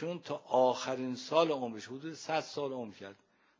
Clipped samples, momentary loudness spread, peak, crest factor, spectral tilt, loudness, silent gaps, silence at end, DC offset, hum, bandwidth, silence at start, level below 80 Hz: under 0.1%; 14 LU; -16 dBFS; 20 dB; -4.5 dB/octave; -34 LUFS; none; 0.45 s; under 0.1%; none; 7.6 kHz; 0 s; -84 dBFS